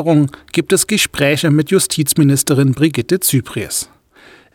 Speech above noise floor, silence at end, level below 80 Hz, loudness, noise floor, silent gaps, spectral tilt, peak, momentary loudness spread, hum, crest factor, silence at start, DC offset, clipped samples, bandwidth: 31 dB; 0.7 s; -48 dBFS; -14 LUFS; -45 dBFS; none; -4.5 dB/octave; 0 dBFS; 8 LU; none; 14 dB; 0 s; under 0.1%; under 0.1%; 18.5 kHz